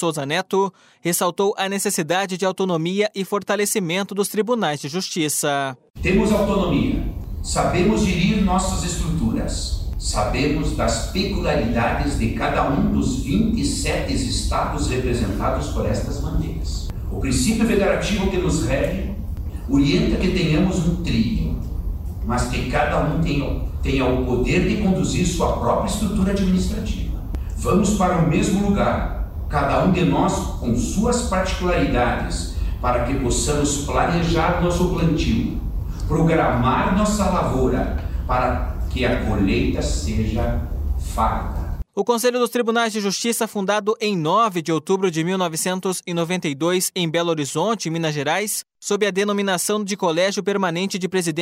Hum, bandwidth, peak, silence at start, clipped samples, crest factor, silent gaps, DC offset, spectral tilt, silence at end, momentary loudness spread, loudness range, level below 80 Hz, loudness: none; 16 kHz; -6 dBFS; 0 s; under 0.1%; 14 dB; 5.90-5.94 s; under 0.1%; -5 dB/octave; 0 s; 7 LU; 2 LU; -28 dBFS; -21 LUFS